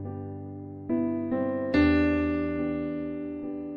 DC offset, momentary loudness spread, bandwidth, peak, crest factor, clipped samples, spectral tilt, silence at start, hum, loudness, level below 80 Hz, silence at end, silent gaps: under 0.1%; 16 LU; 5.2 kHz; -12 dBFS; 16 dB; under 0.1%; -9 dB/octave; 0 s; none; -28 LUFS; -46 dBFS; 0 s; none